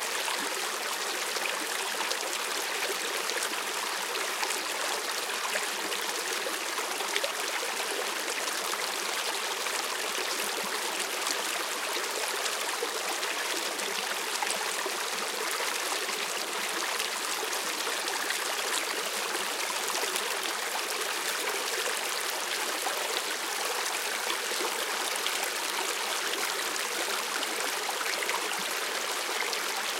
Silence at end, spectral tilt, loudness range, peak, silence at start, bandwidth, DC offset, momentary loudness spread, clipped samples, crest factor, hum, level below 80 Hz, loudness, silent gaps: 0 s; 1 dB/octave; 1 LU; -8 dBFS; 0 s; 17 kHz; under 0.1%; 1 LU; under 0.1%; 24 dB; none; -84 dBFS; -30 LUFS; none